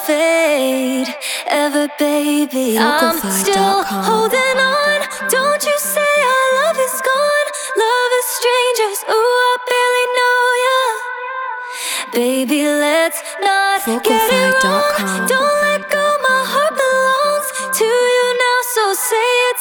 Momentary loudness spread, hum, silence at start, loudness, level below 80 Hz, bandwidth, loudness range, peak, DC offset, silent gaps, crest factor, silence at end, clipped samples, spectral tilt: 5 LU; none; 0 s; -15 LUFS; -60 dBFS; over 20 kHz; 2 LU; 0 dBFS; under 0.1%; none; 14 dB; 0 s; under 0.1%; -2 dB/octave